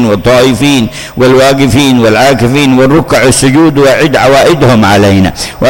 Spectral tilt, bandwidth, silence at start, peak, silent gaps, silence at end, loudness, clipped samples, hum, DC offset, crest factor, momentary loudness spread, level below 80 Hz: -5 dB/octave; 17.5 kHz; 0 s; 0 dBFS; none; 0 s; -6 LUFS; 0.3%; none; under 0.1%; 6 dB; 3 LU; -30 dBFS